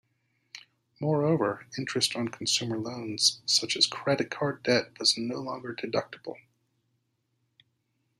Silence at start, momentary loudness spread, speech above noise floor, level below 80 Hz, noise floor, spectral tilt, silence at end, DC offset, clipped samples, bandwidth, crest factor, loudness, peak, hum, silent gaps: 0.55 s; 17 LU; 47 dB; -72 dBFS; -76 dBFS; -3 dB/octave; 1.85 s; under 0.1%; under 0.1%; 15 kHz; 24 dB; -27 LUFS; -6 dBFS; none; none